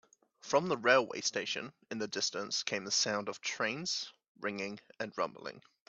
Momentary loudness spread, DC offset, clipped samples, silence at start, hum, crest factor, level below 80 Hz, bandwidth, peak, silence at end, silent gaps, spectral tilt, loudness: 14 LU; under 0.1%; under 0.1%; 0.45 s; none; 24 dB; -80 dBFS; 8.4 kHz; -12 dBFS; 0.3 s; 4.28-4.35 s; -2 dB/octave; -34 LUFS